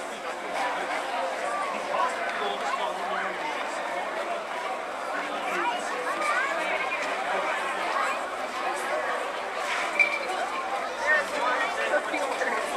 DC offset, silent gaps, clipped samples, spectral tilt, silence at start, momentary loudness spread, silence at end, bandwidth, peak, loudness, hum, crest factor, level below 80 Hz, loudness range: under 0.1%; none; under 0.1%; -1.5 dB/octave; 0 s; 7 LU; 0 s; 15 kHz; -8 dBFS; -28 LUFS; none; 20 dB; -68 dBFS; 4 LU